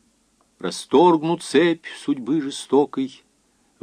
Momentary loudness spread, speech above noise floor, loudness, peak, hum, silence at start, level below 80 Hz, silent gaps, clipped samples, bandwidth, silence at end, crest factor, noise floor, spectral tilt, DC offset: 14 LU; 43 dB; -21 LUFS; -4 dBFS; none; 0.6 s; -72 dBFS; none; under 0.1%; 13 kHz; 0.75 s; 18 dB; -63 dBFS; -5 dB/octave; under 0.1%